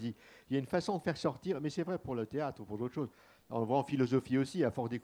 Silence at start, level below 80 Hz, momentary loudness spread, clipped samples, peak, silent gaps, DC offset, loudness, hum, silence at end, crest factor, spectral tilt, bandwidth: 0 s; -68 dBFS; 9 LU; under 0.1%; -18 dBFS; none; under 0.1%; -36 LUFS; none; 0 s; 18 dB; -7 dB/octave; 13.5 kHz